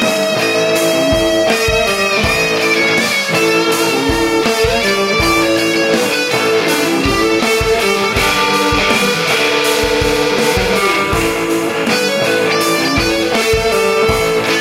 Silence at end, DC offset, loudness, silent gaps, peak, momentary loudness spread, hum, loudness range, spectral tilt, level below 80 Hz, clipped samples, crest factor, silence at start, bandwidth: 0 s; under 0.1%; -12 LUFS; none; 0 dBFS; 2 LU; none; 1 LU; -3.5 dB/octave; -32 dBFS; under 0.1%; 14 dB; 0 s; 16 kHz